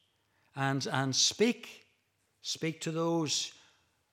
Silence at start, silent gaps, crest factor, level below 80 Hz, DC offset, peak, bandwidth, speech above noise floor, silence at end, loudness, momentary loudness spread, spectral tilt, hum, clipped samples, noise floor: 0.55 s; none; 20 dB; -82 dBFS; under 0.1%; -14 dBFS; 16.5 kHz; 44 dB; 0.6 s; -31 LUFS; 15 LU; -3.5 dB/octave; none; under 0.1%; -76 dBFS